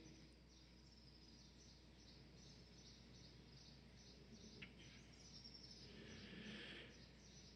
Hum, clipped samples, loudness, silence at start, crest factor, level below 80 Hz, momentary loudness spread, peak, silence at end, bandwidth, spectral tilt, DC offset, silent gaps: none; under 0.1%; -61 LUFS; 0 s; 18 dB; -70 dBFS; 9 LU; -44 dBFS; 0 s; 10 kHz; -4 dB/octave; under 0.1%; none